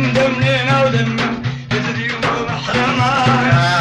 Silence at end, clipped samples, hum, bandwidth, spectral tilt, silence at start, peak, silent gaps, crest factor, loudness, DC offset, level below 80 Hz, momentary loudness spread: 0 s; under 0.1%; none; 9.8 kHz; -5.5 dB/octave; 0 s; -2 dBFS; none; 12 dB; -15 LUFS; under 0.1%; -42 dBFS; 7 LU